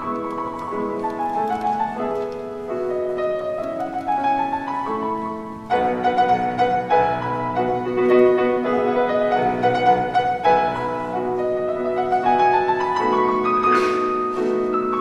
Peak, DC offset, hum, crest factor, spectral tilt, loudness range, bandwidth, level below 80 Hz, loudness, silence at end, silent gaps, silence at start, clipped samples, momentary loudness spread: -4 dBFS; under 0.1%; none; 16 dB; -6.5 dB/octave; 6 LU; 10 kHz; -52 dBFS; -21 LUFS; 0 s; none; 0 s; under 0.1%; 9 LU